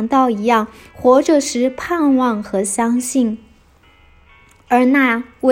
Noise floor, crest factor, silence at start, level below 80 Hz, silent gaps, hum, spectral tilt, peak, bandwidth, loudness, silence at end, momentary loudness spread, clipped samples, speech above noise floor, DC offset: -50 dBFS; 16 dB; 0 s; -52 dBFS; none; none; -4 dB/octave; 0 dBFS; 16 kHz; -16 LUFS; 0 s; 7 LU; under 0.1%; 35 dB; under 0.1%